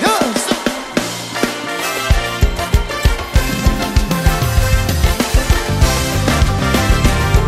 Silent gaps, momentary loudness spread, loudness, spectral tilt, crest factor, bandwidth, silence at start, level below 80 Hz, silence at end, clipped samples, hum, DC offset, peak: none; 5 LU; -16 LUFS; -4.5 dB/octave; 14 dB; 16 kHz; 0 s; -18 dBFS; 0 s; under 0.1%; none; under 0.1%; 0 dBFS